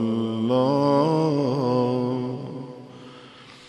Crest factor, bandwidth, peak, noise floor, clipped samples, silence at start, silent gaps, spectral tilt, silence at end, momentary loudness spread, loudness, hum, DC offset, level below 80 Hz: 16 dB; 11 kHz; -8 dBFS; -46 dBFS; under 0.1%; 0 s; none; -8 dB/octave; 0.05 s; 22 LU; -23 LUFS; none; under 0.1%; -66 dBFS